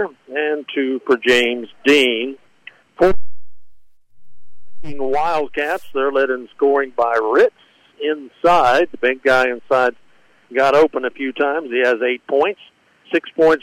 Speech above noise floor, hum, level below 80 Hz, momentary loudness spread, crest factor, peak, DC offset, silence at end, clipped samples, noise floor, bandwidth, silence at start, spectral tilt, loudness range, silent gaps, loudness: 29 dB; none; -46 dBFS; 10 LU; 12 dB; -4 dBFS; under 0.1%; 0.05 s; under 0.1%; -45 dBFS; 16 kHz; 0 s; -4 dB/octave; 6 LU; none; -17 LUFS